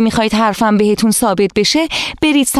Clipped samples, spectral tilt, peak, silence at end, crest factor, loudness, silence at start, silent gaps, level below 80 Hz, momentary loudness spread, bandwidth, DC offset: under 0.1%; -3.5 dB/octave; -2 dBFS; 0 s; 10 dB; -13 LUFS; 0 s; none; -40 dBFS; 2 LU; 15 kHz; 0.2%